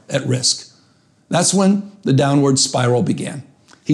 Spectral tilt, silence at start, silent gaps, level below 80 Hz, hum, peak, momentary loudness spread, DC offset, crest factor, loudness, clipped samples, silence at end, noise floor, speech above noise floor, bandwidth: -4.5 dB/octave; 0.1 s; none; -58 dBFS; none; -4 dBFS; 10 LU; under 0.1%; 12 dB; -16 LUFS; under 0.1%; 0 s; -55 dBFS; 39 dB; 12.5 kHz